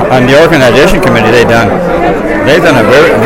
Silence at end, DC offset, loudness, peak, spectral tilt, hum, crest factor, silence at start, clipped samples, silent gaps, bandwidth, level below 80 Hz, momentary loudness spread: 0 s; under 0.1%; -5 LUFS; 0 dBFS; -5.5 dB/octave; none; 6 dB; 0 s; 5%; none; 17 kHz; -24 dBFS; 5 LU